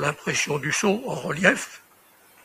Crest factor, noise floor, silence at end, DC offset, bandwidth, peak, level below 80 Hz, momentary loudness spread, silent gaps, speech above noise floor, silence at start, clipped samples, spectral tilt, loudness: 24 dB; -56 dBFS; 0.65 s; under 0.1%; 15.5 kHz; -2 dBFS; -62 dBFS; 9 LU; none; 32 dB; 0 s; under 0.1%; -3.5 dB/octave; -23 LUFS